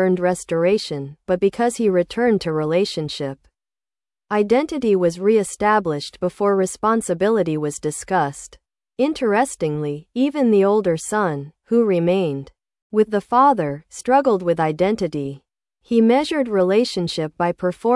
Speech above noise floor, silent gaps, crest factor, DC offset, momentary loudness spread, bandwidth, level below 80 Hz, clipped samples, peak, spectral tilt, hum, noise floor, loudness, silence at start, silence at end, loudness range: over 71 dB; 12.82-12.90 s; 16 dB; under 0.1%; 10 LU; 12 kHz; -56 dBFS; under 0.1%; -4 dBFS; -5.5 dB/octave; none; under -90 dBFS; -20 LUFS; 0 s; 0 s; 2 LU